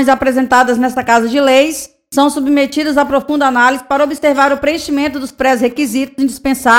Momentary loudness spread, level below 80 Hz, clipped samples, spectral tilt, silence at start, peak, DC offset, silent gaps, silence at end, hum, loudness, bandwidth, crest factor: 6 LU; -44 dBFS; 0.2%; -3 dB/octave; 0 s; 0 dBFS; under 0.1%; none; 0 s; none; -13 LUFS; 16.5 kHz; 12 dB